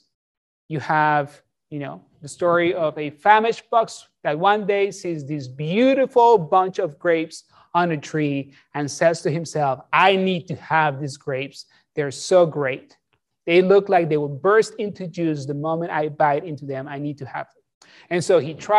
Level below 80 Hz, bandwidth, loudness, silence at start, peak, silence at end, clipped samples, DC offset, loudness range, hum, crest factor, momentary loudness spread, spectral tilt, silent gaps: -70 dBFS; 12 kHz; -21 LUFS; 0.7 s; -2 dBFS; 0 s; under 0.1%; under 0.1%; 4 LU; none; 18 dB; 16 LU; -5.5 dB/octave; 17.74-17.81 s